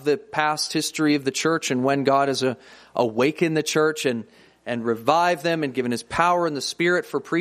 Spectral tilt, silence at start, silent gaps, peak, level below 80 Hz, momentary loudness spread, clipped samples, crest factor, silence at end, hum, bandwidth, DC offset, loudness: -4 dB/octave; 0 s; none; -2 dBFS; -62 dBFS; 7 LU; under 0.1%; 20 dB; 0 s; none; 15.5 kHz; under 0.1%; -22 LUFS